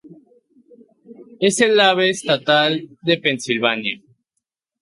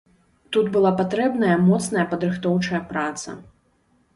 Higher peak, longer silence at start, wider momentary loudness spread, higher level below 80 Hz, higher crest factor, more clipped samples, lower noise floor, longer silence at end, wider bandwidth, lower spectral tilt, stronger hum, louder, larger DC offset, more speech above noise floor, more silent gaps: first, -2 dBFS vs -8 dBFS; second, 0.1 s vs 0.5 s; about the same, 10 LU vs 10 LU; second, -66 dBFS vs -58 dBFS; about the same, 18 dB vs 14 dB; neither; first, -78 dBFS vs -63 dBFS; about the same, 0.85 s vs 0.75 s; about the same, 11.5 kHz vs 11.5 kHz; second, -3.5 dB/octave vs -6 dB/octave; neither; first, -17 LUFS vs -21 LUFS; neither; first, 60 dB vs 42 dB; neither